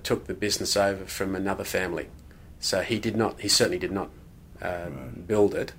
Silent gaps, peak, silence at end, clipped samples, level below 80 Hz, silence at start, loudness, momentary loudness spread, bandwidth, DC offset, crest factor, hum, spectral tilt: none; -8 dBFS; 0 s; under 0.1%; -50 dBFS; 0 s; -27 LUFS; 14 LU; 16 kHz; under 0.1%; 18 dB; none; -3.5 dB/octave